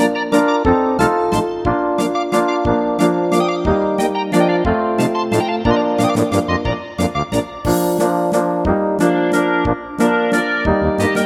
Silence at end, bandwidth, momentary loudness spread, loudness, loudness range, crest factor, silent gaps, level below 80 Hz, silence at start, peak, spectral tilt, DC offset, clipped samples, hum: 0 s; 18.5 kHz; 4 LU; -17 LUFS; 1 LU; 16 dB; none; -34 dBFS; 0 s; 0 dBFS; -6 dB/octave; under 0.1%; under 0.1%; none